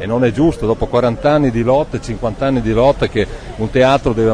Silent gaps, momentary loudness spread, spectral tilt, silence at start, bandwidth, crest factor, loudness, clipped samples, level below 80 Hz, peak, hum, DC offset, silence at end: none; 8 LU; -7 dB/octave; 0 s; 10.5 kHz; 14 dB; -15 LUFS; under 0.1%; -30 dBFS; 0 dBFS; none; under 0.1%; 0 s